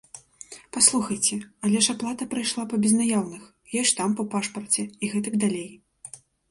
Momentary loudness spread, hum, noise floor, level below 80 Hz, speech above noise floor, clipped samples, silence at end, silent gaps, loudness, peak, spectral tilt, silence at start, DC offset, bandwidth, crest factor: 23 LU; none; -47 dBFS; -66 dBFS; 22 dB; under 0.1%; 0.35 s; none; -24 LUFS; -4 dBFS; -3 dB/octave; 0.15 s; under 0.1%; 11.5 kHz; 22 dB